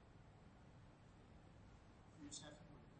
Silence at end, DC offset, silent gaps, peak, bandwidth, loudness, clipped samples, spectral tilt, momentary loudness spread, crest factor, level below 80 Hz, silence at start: 0 s; under 0.1%; none; -42 dBFS; 8.4 kHz; -62 LUFS; under 0.1%; -4 dB/octave; 11 LU; 20 dB; -72 dBFS; 0 s